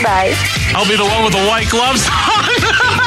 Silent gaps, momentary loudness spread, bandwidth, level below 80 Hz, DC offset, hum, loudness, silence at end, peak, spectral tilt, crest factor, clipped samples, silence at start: none; 2 LU; 16 kHz; -30 dBFS; under 0.1%; none; -12 LUFS; 0 s; -2 dBFS; -3 dB/octave; 10 dB; under 0.1%; 0 s